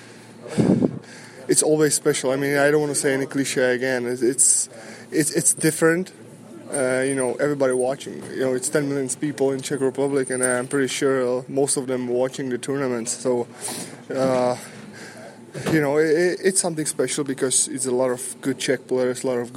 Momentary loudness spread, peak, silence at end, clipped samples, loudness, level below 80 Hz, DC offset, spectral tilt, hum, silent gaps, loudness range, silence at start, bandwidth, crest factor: 12 LU; -2 dBFS; 0 s; under 0.1%; -21 LUFS; -66 dBFS; under 0.1%; -3.5 dB/octave; none; none; 4 LU; 0 s; 16.5 kHz; 20 dB